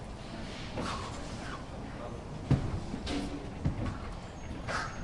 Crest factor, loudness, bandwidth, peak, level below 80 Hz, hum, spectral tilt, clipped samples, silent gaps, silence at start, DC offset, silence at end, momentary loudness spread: 22 dB; -38 LUFS; 11.5 kHz; -14 dBFS; -44 dBFS; none; -6 dB/octave; under 0.1%; none; 0 s; under 0.1%; 0 s; 11 LU